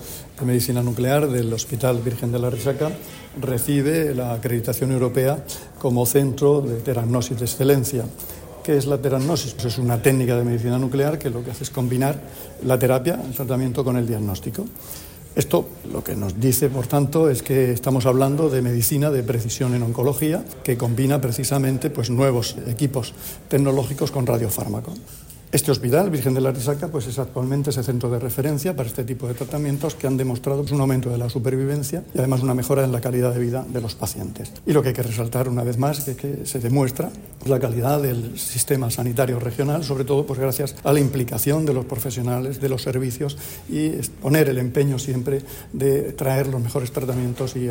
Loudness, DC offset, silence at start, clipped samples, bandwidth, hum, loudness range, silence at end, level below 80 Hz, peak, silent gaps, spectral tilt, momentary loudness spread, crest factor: -22 LUFS; under 0.1%; 0 s; under 0.1%; 16.5 kHz; none; 3 LU; 0 s; -46 dBFS; -4 dBFS; none; -6 dB/octave; 9 LU; 18 dB